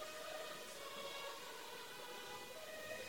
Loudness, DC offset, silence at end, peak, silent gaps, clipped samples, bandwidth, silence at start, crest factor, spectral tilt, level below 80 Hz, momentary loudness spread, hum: -49 LUFS; under 0.1%; 0 s; -36 dBFS; none; under 0.1%; 17.5 kHz; 0 s; 14 dB; -1 dB/octave; -80 dBFS; 3 LU; none